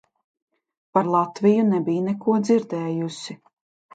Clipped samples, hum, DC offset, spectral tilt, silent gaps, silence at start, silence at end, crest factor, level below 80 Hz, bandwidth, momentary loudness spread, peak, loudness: under 0.1%; none; under 0.1%; -7 dB/octave; none; 0.95 s; 0.6 s; 18 dB; -72 dBFS; 9 kHz; 10 LU; -4 dBFS; -22 LUFS